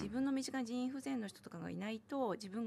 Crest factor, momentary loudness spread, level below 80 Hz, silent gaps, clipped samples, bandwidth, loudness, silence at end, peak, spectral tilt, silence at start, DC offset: 14 dB; 8 LU; -72 dBFS; none; under 0.1%; 13.5 kHz; -41 LUFS; 0 s; -26 dBFS; -5 dB/octave; 0 s; under 0.1%